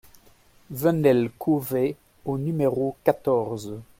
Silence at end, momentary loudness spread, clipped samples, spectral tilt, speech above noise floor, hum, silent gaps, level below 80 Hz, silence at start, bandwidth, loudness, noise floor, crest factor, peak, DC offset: 0.15 s; 11 LU; under 0.1%; -7.5 dB/octave; 32 dB; none; none; -60 dBFS; 0.7 s; 16.5 kHz; -24 LUFS; -56 dBFS; 22 dB; -4 dBFS; under 0.1%